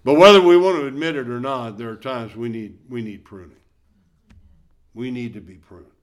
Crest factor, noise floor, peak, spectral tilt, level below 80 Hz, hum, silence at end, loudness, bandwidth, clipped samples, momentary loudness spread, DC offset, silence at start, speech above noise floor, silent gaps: 20 dB; -60 dBFS; 0 dBFS; -5.5 dB/octave; -56 dBFS; none; 0.25 s; -17 LUFS; 12.5 kHz; under 0.1%; 23 LU; under 0.1%; 0.05 s; 42 dB; none